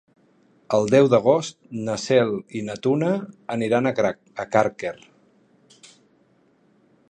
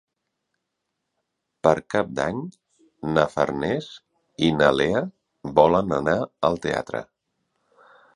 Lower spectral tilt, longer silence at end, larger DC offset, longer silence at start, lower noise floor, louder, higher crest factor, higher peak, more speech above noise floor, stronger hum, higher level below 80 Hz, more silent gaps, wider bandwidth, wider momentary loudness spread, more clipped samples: about the same, -6 dB/octave vs -6 dB/octave; first, 2.15 s vs 1.1 s; neither; second, 0.7 s vs 1.65 s; second, -61 dBFS vs -80 dBFS; about the same, -22 LUFS vs -23 LUFS; about the same, 20 dB vs 24 dB; about the same, -2 dBFS vs -2 dBFS; second, 39 dB vs 58 dB; neither; second, -64 dBFS vs -52 dBFS; neither; second, 9.8 kHz vs 11 kHz; about the same, 15 LU vs 15 LU; neither